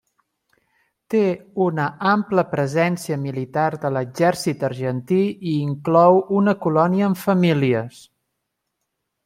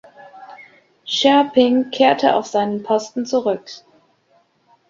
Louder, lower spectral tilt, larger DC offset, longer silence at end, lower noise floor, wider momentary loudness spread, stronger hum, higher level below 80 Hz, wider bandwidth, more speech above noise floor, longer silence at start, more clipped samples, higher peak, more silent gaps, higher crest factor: second, -20 LUFS vs -17 LUFS; first, -7 dB/octave vs -4 dB/octave; neither; first, 1.35 s vs 1.1 s; first, -78 dBFS vs -59 dBFS; second, 8 LU vs 13 LU; neither; about the same, -64 dBFS vs -66 dBFS; first, 16 kHz vs 7.6 kHz; first, 58 dB vs 43 dB; first, 1.1 s vs 0.35 s; neither; about the same, -2 dBFS vs -2 dBFS; neither; about the same, 18 dB vs 18 dB